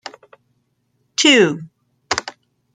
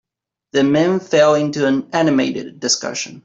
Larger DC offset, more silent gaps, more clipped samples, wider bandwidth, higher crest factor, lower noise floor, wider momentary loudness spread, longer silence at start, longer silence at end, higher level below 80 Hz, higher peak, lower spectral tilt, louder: neither; neither; neither; first, 9.6 kHz vs 8.2 kHz; first, 20 dB vs 14 dB; second, -67 dBFS vs -79 dBFS; first, 23 LU vs 8 LU; first, 1.2 s vs 0.55 s; first, 0.45 s vs 0.05 s; about the same, -60 dBFS vs -60 dBFS; about the same, 0 dBFS vs -2 dBFS; second, -2.5 dB/octave vs -4 dB/octave; about the same, -16 LUFS vs -17 LUFS